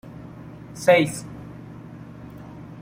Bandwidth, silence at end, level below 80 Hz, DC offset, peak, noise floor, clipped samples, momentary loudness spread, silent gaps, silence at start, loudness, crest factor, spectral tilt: 16 kHz; 0 s; -54 dBFS; under 0.1%; -4 dBFS; -40 dBFS; under 0.1%; 23 LU; none; 0.05 s; -20 LUFS; 22 dB; -5 dB/octave